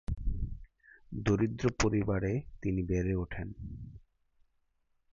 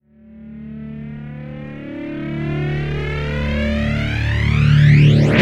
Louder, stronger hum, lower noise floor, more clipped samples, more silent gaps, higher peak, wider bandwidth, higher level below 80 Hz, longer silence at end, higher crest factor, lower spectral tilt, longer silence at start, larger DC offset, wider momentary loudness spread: second, -33 LUFS vs -17 LUFS; neither; first, -75 dBFS vs -40 dBFS; neither; neither; second, -14 dBFS vs 0 dBFS; about the same, 7.6 kHz vs 7.2 kHz; second, -44 dBFS vs -28 dBFS; first, 1.15 s vs 0 s; about the same, 20 dB vs 16 dB; second, -6.5 dB/octave vs -8 dB/octave; second, 0.1 s vs 0.3 s; neither; second, 16 LU vs 20 LU